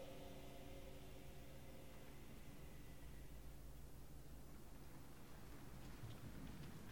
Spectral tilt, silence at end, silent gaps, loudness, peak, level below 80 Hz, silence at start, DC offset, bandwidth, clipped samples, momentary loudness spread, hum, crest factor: -5.5 dB/octave; 0 s; none; -59 LUFS; -42 dBFS; -62 dBFS; 0 s; 0.1%; 17.5 kHz; under 0.1%; 5 LU; none; 14 dB